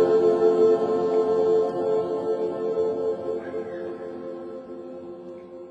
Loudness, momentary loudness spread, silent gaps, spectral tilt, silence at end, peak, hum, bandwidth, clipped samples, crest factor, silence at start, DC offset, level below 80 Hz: -23 LUFS; 19 LU; none; -7.5 dB/octave; 0 s; -8 dBFS; none; 7.8 kHz; under 0.1%; 14 dB; 0 s; under 0.1%; -70 dBFS